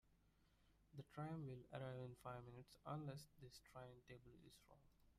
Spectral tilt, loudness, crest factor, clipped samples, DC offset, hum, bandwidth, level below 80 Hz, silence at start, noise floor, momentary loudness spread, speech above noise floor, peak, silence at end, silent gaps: -6.5 dB/octave; -57 LUFS; 18 dB; under 0.1%; under 0.1%; 50 Hz at -70 dBFS; 15 kHz; -78 dBFS; 0.05 s; -78 dBFS; 12 LU; 22 dB; -38 dBFS; 0 s; none